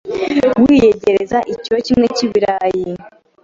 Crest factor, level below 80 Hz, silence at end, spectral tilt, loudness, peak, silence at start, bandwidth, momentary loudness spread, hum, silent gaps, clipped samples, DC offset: 12 dB; -44 dBFS; 0.35 s; -5.5 dB/octave; -14 LUFS; -2 dBFS; 0.05 s; 7.6 kHz; 9 LU; none; none; under 0.1%; under 0.1%